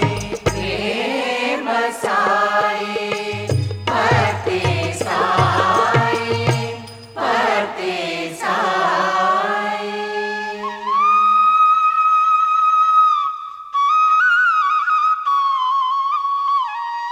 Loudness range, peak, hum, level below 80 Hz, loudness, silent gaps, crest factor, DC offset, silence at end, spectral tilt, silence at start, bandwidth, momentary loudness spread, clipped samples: 5 LU; -2 dBFS; none; -48 dBFS; -17 LUFS; none; 14 dB; under 0.1%; 0 s; -4.5 dB/octave; 0 s; 16 kHz; 10 LU; under 0.1%